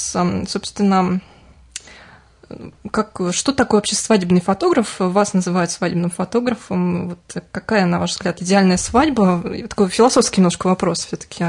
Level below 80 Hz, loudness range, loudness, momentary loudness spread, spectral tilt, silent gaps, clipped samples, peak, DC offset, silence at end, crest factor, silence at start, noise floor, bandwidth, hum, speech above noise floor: -46 dBFS; 5 LU; -18 LUFS; 13 LU; -5 dB/octave; none; under 0.1%; -2 dBFS; under 0.1%; 0 s; 16 dB; 0 s; -46 dBFS; 11 kHz; none; 28 dB